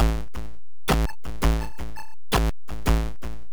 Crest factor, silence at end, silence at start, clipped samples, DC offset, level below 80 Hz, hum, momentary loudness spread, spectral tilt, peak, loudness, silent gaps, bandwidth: 14 dB; 0 s; 0 s; under 0.1%; 4%; -28 dBFS; none; 15 LU; -5.5 dB/octave; -12 dBFS; -27 LUFS; none; over 20 kHz